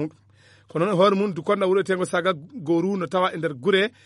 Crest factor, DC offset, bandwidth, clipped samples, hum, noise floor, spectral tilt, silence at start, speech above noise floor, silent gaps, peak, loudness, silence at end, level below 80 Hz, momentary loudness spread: 16 dB; under 0.1%; 11.5 kHz; under 0.1%; none; -55 dBFS; -6 dB/octave; 0 s; 33 dB; none; -6 dBFS; -23 LUFS; 0.15 s; -72 dBFS; 7 LU